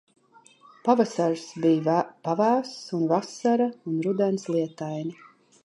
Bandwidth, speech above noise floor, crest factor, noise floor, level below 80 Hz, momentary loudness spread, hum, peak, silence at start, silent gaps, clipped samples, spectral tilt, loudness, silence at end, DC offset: 11.5 kHz; 31 dB; 20 dB; -56 dBFS; -78 dBFS; 9 LU; none; -6 dBFS; 0.85 s; none; under 0.1%; -6.5 dB/octave; -25 LUFS; 0.5 s; under 0.1%